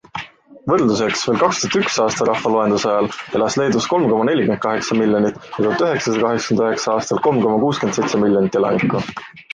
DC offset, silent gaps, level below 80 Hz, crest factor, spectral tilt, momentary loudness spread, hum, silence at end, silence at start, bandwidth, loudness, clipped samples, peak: under 0.1%; none; -54 dBFS; 14 dB; -5 dB/octave; 5 LU; none; 0.15 s; 0.15 s; 9.6 kHz; -17 LUFS; under 0.1%; -2 dBFS